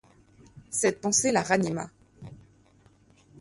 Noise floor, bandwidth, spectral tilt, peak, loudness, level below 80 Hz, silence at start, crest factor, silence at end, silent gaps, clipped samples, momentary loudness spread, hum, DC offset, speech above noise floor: -60 dBFS; 11.5 kHz; -3.5 dB/octave; -8 dBFS; -26 LUFS; -62 dBFS; 0.55 s; 22 dB; 1.05 s; none; under 0.1%; 25 LU; none; under 0.1%; 34 dB